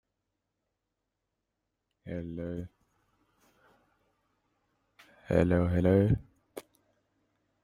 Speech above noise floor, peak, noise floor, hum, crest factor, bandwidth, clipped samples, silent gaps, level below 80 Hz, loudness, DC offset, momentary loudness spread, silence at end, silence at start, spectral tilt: 57 dB; -10 dBFS; -85 dBFS; none; 24 dB; 15 kHz; under 0.1%; none; -54 dBFS; -29 LUFS; under 0.1%; 24 LU; 1.05 s; 2.05 s; -9 dB/octave